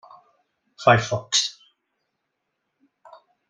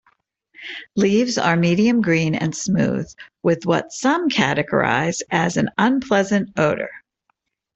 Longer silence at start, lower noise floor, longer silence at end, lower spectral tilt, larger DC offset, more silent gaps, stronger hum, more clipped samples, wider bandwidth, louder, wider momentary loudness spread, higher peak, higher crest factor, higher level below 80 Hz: first, 0.8 s vs 0.6 s; first, -78 dBFS vs -71 dBFS; first, 2 s vs 0.75 s; second, -3 dB/octave vs -5 dB/octave; neither; neither; neither; neither; first, 10 kHz vs 8.2 kHz; about the same, -21 LUFS vs -19 LUFS; second, 5 LU vs 10 LU; about the same, -2 dBFS vs -2 dBFS; first, 24 dB vs 18 dB; about the same, -60 dBFS vs -56 dBFS